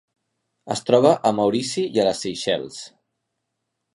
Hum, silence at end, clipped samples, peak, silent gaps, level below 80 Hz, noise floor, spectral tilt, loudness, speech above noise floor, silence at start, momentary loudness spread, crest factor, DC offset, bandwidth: none; 1.05 s; under 0.1%; -2 dBFS; none; -64 dBFS; -78 dBFS; -4.5 dB/octave; -21 LUFS; 58 dB; 0.65 s; 16 LU; 20 dB; under 0.1%; 11.5 kHz